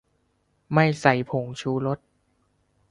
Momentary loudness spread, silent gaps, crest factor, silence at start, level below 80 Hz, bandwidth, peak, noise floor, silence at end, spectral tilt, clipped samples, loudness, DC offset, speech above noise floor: 10 LU; none; 22 dB; 0.7 s; -60 dBFS; 11 kHz; -4 dBFS; -69 dBFS; 0.95 s; -6.5 dB/octave; under 0.1%; -24 LUFS; under 0.1%; 46 dB